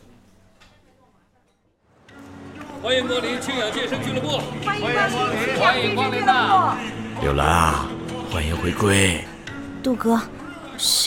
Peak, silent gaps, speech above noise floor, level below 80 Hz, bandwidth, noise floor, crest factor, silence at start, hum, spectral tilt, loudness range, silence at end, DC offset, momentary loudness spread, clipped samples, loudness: -2 dBFS; none; 43 dB; -40 dBFS; 17.5 kHz; -63 dBFS; 20 dB; 2.1 s; none; -3.5 dB/octave; 7 LU; 0 s; under 0.1%; 16 LU; under 0.1%; -21 LUFS